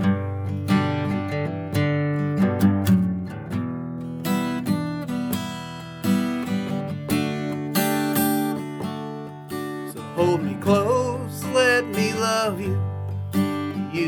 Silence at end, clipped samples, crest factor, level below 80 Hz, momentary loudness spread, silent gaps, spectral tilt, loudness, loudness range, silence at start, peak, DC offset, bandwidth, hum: 0 s; under 0.1%; 16 dB; -58 dBFS; 11 LU; none; -6 dB/octave; -24 LUFS; 4 LU; 0 s; -6 dBFS; under 0.1%; over 20 kHz; none